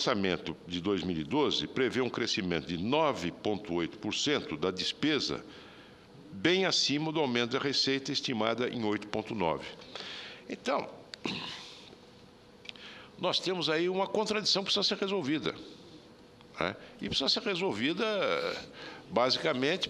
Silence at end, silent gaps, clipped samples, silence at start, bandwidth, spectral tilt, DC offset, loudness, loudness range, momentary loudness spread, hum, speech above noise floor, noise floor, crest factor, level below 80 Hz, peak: 0 s; none; under 0.1%; 0 s; 12 kHz; -4 dB/octave; under 0.1%; -31 LUFS; 6 LU; 16 LU; none; 24 dB; -56 dBFS; 22 dB; -64 dBFS; -10 dBFS